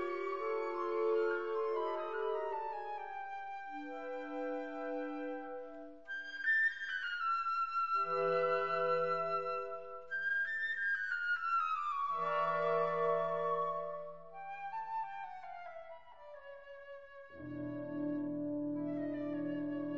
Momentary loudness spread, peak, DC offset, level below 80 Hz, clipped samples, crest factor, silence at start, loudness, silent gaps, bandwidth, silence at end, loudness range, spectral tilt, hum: 16 LU; -22 dBFS; 0.2%; -76 dBFS; under 0.1%; 16 dB; 0 s; -37 LUFS; none; 7.6 kHz; 0 s; 10 LU; -3 dB/octave; none